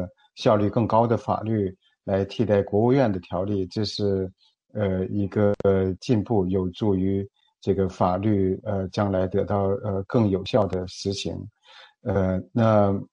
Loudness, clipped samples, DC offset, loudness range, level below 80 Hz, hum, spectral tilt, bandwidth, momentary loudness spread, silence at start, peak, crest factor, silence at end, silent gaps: -24 LUFS; under 0.1%; under 0.1%; 2 LU; -54 dBFS; none; -7.5 dB/octave; 9.2 kHz; 9 LU; 0 s; -6 dBFS; 18 dB; 0.05 s; none